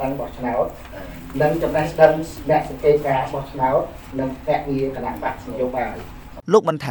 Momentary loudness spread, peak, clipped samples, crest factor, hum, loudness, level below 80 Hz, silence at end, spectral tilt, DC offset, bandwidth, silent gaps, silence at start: 14 LU; -2 dBFS; under 0.1%; 20 dB; none; -21 LUFS; -40 dBFS; 0 s; -6.5 dB/octave; under 0.1%; over 20 kHz; none; 0 s